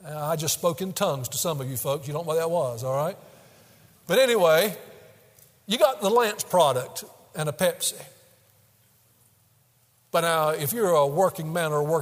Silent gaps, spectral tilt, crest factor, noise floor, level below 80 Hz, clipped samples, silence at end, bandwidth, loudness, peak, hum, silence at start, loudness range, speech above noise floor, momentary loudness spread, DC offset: none; -3.5 dB/octave; 20 dB; -63 dBFS; -68 dBFS; under 0.1%; 0 s; 16 kHz; -24 LUFS; -6 dBFS; none; 0 s; 6 LU; 39 dB; 10 LU; under 0.1%